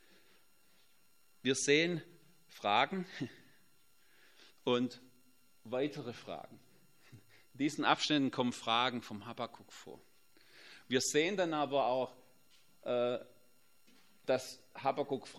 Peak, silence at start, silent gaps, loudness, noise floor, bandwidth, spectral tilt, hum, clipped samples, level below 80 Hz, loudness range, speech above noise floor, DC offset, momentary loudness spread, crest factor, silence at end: -12 dBFS; 1.45 s; none; -35 LUFS; -72 dBFS; 16 kHz; -3.5 dB/octave; none; under 0.1%; -84 dBFS; 6 LU; 37 dB; under 0.1%; 17 LU; 26 dB; 0 s